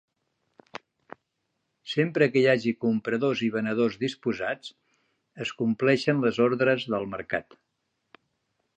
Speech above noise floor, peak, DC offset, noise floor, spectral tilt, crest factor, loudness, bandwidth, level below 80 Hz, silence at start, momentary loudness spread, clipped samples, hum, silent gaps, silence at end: 53 dB; -8 dBFS; under 0.1%; -79 dBFS; -6.5 dB/octave; 20 dB; -26 LUFS; 8.8 kHz; -68 dBFS; 0.75 s; 16 LU; under 0.1%; none; none; 1.35 s